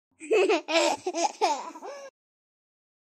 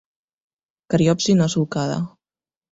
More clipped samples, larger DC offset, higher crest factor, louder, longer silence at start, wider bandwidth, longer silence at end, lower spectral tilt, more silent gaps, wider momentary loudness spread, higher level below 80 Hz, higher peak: neither; neither; about the same, 20 dB vs 16 dB; second, -26 LUFS vs -20 LUFS; second, 0.2 s vs 0.9 s; first, 13 kHz vs 8 kHz; first, 0.95 s vs 0.65 s; second, -0.5 dB/octave vs -6 dB/octave; neither; first, 18 LU vs 9 LU; second, -82 dBFS vs -54 dBFS; about the same, -8 dBFS vs -6 dBFS